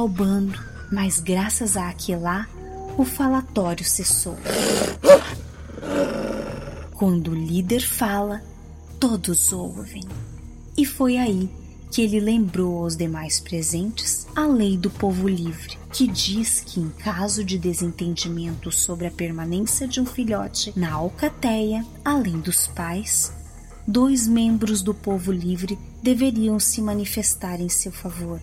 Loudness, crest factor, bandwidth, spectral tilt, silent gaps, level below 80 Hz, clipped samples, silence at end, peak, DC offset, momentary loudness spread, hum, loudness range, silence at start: -22 LUFS; 22 dB; 16.5 kHz; -4 dB/octave; none; -40 dBFS; under 0.1%; 0 s; 0 dBFS; under 0.1%; 12 LU; none; 4 LU; 0 s